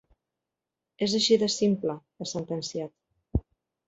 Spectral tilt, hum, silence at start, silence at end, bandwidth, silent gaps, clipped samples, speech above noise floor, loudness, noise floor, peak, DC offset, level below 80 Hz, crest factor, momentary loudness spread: -4.5 dB/octave; none; 1 s; 0.5 s; 8.2 kHz; none; under 0.1%; 61 dB; -28 LUFS; -88 dBFS; -10 dBFS; under 0.1%; -46 dBFS; 20 dB; 14 LU